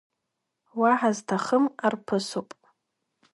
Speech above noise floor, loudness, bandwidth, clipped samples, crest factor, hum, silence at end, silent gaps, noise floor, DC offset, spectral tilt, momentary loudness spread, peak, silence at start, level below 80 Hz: 57 dB; -25 LUFS; 11.5 kHz; under 0.1%; 20 dB; none; 0.9 s; none; -82 dBFS; under 0.1%; -5 dB/octave; 11 LU; -8 dBFS; 0.75 s; -76 dBFS